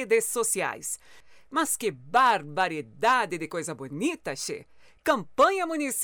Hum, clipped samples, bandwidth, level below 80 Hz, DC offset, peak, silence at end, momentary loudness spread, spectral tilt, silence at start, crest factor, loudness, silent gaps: none; under 0.1%; over 20 kHz; -66 dBFS; under 0.1%; -12 dBFS; 0 s; 11 LU; -2.5 dB/octave; 0 s; 16 dB; -27 LUFS; none